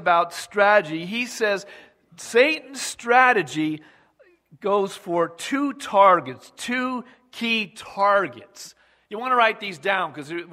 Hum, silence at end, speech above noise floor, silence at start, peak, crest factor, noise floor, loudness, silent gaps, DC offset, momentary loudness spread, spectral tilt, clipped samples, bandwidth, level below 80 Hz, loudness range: none; 0 s; 36 dB; 0 s; -2 dBFS; 20 dB; -58 dBFS; -21 LUFS; none; under 0.1%; 17 LU; -3.5 dB/octave; under 0.1%; 16 kHz; -72 dBFS; 3 LU